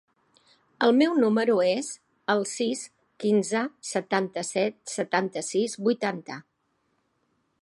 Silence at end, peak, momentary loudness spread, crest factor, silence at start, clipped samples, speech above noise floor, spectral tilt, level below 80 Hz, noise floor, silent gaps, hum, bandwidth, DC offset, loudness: 1.2 s; -8 dBFS; 13 LU; 20 dB; 0.8 s; under 0.1%; 48 dB; -4 dB/octave; -78 dBFS; -73 dBFS; none; none; 11.5 kHz; under 0.1%; -26 LUFS